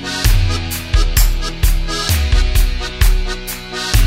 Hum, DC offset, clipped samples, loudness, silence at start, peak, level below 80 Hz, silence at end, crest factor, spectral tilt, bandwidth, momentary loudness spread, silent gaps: none; under 0.1%; under 0.1%; -17 LUFS; 0 s; 0 dBFS; -14 dBFS; 0 s; 14 dB; -3.5 dB/octave; 16.5 kHz; 6 LU; none